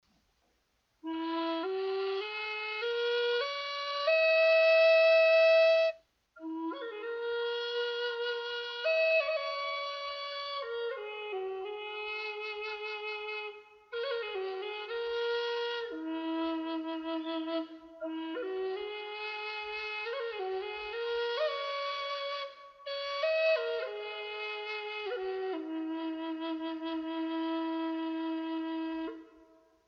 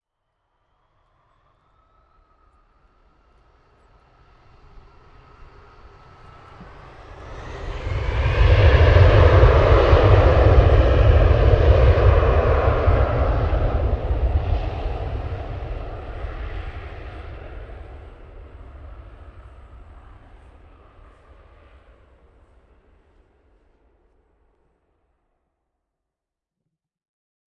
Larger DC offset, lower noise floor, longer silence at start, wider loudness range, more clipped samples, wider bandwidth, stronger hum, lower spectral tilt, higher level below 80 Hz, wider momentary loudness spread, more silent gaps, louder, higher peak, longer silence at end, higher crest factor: neither; second, -76 dBFS vs -86 dBFS; second, 1.05 s vs 6.6 s; second, 12 LU vs 23 LU; neither; about the same, 6.2 kHz vs 6.4 kHz; neither; second, -2.5 dB/octave vs -8.5 dB/octave; second, -76 dBFS vs -24 dBFS; second, 14 LU vs 24 LU; neither; second, -32 LUFS vs -17 LUFS; second, -18 dBFS vs 0 dBFS; second, 0.45 s vs 8.15 s; about the same, 16 dB vs 20 dB